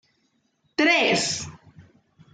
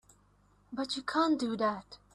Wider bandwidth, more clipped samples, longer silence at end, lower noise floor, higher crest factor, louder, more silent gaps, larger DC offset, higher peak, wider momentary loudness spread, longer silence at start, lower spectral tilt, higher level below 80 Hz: second, 9.6 kHz vs 11 kHz; neither; first, 0.5 s vs 0.2 s; about the same, -69 dBFS vs -66 dBFS; about the same, 18 dB vs 18 dB; first, -21 LUFS vs -32 LUFS; neither; neither; first, -8 dBFS vs -16 dBFS; about the same, 14 LU vs 13 LU; about the same, 0.8 s vs 0.7 s; second, -2.5 dB/octave vs -4 dB/octave; about the same, -66 dBFS vs -68 dBFS